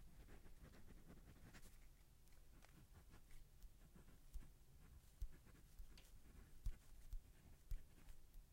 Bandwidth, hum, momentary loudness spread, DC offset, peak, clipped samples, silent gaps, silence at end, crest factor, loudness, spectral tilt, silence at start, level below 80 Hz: 16 kHz; none; 10 LU; under 0.1%; -36 dBFS; under 0.1%; none; 0 s; 22 dB; -65 LUFS; -5 dB/octave; 0 s; -60 dBFS